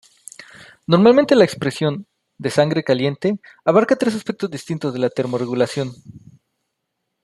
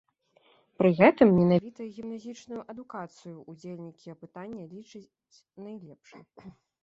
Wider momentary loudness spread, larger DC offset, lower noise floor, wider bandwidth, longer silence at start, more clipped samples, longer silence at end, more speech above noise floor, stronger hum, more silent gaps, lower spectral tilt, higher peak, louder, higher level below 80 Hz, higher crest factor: second, 18 LU vs 26 LU; neither; first, -76 dBFS vs -65 dBFS; first, 12.5 kHz vs 7.6 kHz; second, 0.4 s vs 0.8 s; neither; first, 1.05 s vs 0.35 s; first, 58 dB vs 37 dB; neither; neither; second, -6.5 dB/octave vs -8.5 dB/octave; first, 0 dBFS vs -6 dBFS; first, -18 LUFS vs -22 LUFS; about the same, -62 dBFS vs -64 dBFS; second, 18 dB vs 24 dB